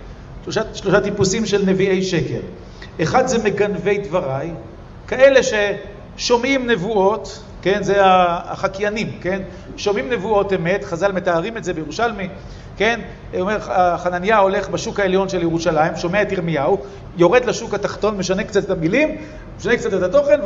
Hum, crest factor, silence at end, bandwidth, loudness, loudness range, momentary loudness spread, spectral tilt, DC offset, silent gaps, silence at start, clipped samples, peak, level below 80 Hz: none; 18 dB; 0 s; 8 kHz; -18 LUFS; 3 LU; 14 LU; -5 dB/octave; under 0.1%; none; 0 s; under 0.1%; 0 dBFS; -40 dBFS